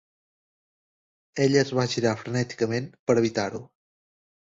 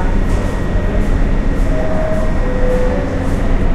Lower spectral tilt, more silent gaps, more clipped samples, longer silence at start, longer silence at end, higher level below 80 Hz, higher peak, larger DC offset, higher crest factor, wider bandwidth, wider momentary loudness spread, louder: second, -5.5 dB/octave vs -7.5 dB/octave; first, 2.99-3.07 s vs none; neither; first, 1.35 s vs 0 s; first, 0.75 s vs 0 s; second, -62 dBFS vs -14 dBFS; second, -6 dBFS vs -2 dBFS; neither; first, 20 dB vs 12 dB; second, 8 kHz vs 9.4 kHz; first, 9 LU vs 2 LU; second, -25 LUFS vs -18 LUFS